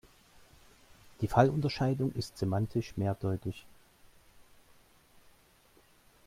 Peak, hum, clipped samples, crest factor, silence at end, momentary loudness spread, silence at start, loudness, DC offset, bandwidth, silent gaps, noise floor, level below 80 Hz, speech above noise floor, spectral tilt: -10 dBFS; none; under 0.1%; 24 dB; 2.65 s; 12 LU; 1.2 s; -32 LUFS; under 0.1%; 16 kHz; none; -64 dBFS; -58 dBFS; 33 dB; -7.5 dB/octave